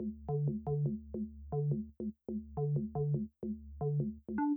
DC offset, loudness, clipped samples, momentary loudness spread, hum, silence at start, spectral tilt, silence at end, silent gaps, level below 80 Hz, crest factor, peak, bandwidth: under 0.1%; -38 LUFS; under 0.1%; 8 LU; none; 0 s; -14 dB/octave; 0 s; none; -54 dBFS; 14 dB; -24 dBFS; 2.2 kHz